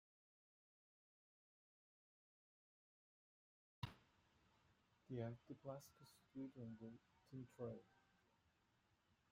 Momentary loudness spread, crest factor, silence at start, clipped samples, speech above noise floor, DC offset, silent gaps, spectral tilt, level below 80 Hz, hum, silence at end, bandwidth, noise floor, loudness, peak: 10 LU; 26 dB; 3.8 s; under 0.1%; 27 dB; under 0.1%; none; -7 dB/octave; -84 dBFS; none; 1.3 s; 14.5 kHz; -83 dBFS; -56 LUFS; -34 dBFS